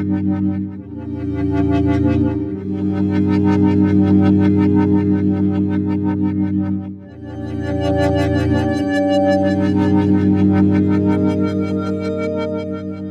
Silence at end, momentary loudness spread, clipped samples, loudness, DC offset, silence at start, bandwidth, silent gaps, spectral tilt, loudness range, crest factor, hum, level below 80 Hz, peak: 0 s; 11 LU; under 0.1%; -17 LUFS; under 0.1%; 0 s; 8 kHz; none; -9 dB/octave; 4 LU; 12 dB; none; -40 dBFS; -4 dBFS